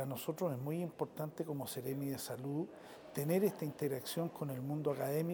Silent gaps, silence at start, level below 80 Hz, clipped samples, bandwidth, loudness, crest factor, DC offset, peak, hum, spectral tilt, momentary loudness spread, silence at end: none; 0 s; -80 dBFS; under 0.1%; over 20 kHz; -40 LUFS; 18 dB; under 0.1%; -22 dBFS; none; -6 dB/octave; 7 LU; 0 s